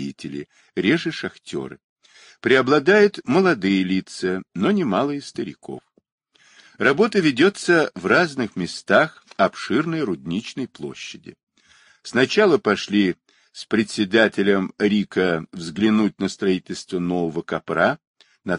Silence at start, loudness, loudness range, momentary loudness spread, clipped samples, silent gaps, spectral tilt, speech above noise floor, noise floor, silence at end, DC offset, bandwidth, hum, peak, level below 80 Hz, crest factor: 0 s; -20 LUFS; 4 LU; 15 LU; under 0.1%; 1.84-1.96 s, 6.12-6.18 s, 11.43-11.47 s, 18.07-18.14 s; -5.5 dB/octave; 35 dB; -55 dBFS; 0 s; under 0.1%; 11 kHz; none; -2 dBFS; -62 dBFS; 18 dB